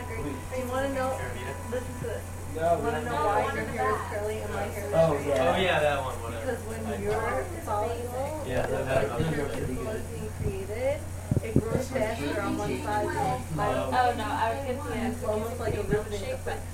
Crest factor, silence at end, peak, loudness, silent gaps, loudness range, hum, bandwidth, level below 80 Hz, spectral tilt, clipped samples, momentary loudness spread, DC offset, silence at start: 22 dB; 0 s; -6 dBFS; -29 LUFS; none; 3 LU; none; 16.5 kHz; -44 dBFS; -5.5 dB/octave; under 0.1%; 9 LU; under 0.1%; 0 s